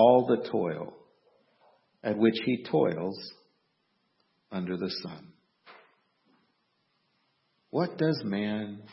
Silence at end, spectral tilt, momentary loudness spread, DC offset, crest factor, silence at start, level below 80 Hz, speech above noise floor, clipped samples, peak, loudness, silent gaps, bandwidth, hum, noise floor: 0.05 s; -10 dB/octave; 15 LU; under 0.1%; 24 dB; 0 s; -74 dBFS; 47 dB; under 0.1%; -8 dBFS; -29 LUFS; none; 6 kHz; none; -75 dBFS